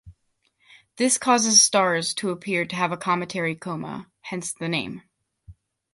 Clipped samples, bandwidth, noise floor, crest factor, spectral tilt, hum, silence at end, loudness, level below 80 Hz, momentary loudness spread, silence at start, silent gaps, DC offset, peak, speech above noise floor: under 0.1%; 12 kHz; -70 dBFS; 22 dB; -2 dB/octave; none; 0.4 s; -22 LUFS; -62 dBFS; 19 LU; 0.05 s; none; under 0.1%; -4 dBFS; 46 dB